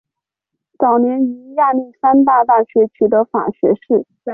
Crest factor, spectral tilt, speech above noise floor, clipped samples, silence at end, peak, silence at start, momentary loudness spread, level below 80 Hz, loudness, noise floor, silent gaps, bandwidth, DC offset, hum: 12 dB; -11.5 dB/octave; 68 dB; under 0.1%; 0 s; -2 dBFS; 0.8 s; 7 LU; -60 dBFS; -15 LUFS; -82 dBFS; none; 3.3 kHz; under 0.1%; none